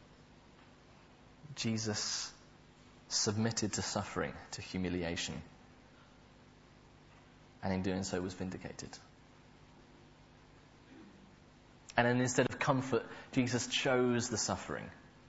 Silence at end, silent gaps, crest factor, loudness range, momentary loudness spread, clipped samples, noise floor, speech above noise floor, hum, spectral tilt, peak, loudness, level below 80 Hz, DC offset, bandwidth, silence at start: 0.1 s; none; 26 dB; 10 LU; 17 LU; under 0.1%; -60 dBFS; 25 dB; 50 Hz at -65 dBFS; -4 dB/octave; -12 dBFS; -35 LUFS; -64 dBFS; under 0.1%; 8 kHz; 0 s